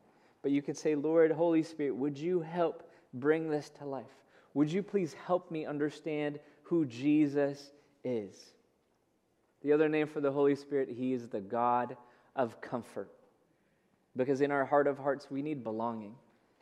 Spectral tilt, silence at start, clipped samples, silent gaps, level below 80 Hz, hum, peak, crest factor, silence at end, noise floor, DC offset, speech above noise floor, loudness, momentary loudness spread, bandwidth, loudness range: -7 dB/octave; 0.45 s; under 0.1%; none; -88 dBFS; none; -14 dBFS; 20 dB; 0.45 s; -74 dBFS; under 0.1%; 42 dB; -33 LUFS; 14 LU; 10.5 kHz; 4 LU